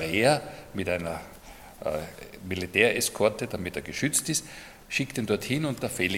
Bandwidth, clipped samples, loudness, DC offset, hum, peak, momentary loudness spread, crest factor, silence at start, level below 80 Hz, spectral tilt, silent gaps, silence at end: 17.5 kHz; under 0.1%; -28 LUFS; under 0.1%; none; -4 dBFS; 19 LU; 24 dB; 0 s; -56 dBFS; -3.5 dB/octave; none; 0 s